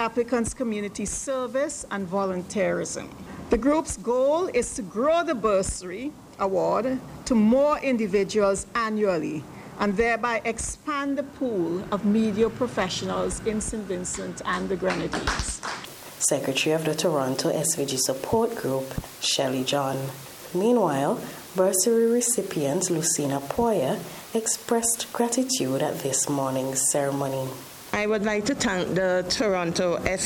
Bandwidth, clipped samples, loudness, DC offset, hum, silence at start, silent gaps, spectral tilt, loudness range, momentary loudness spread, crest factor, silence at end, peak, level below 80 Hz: 17.5 kHz; under 0.1%; -25 LUFS; under 0.1%; none; 0 s; none; -3.5 dB/octave; 3 LU; 8 LU; 18 dB; 0 s; -8 dBFS; -48 dBFS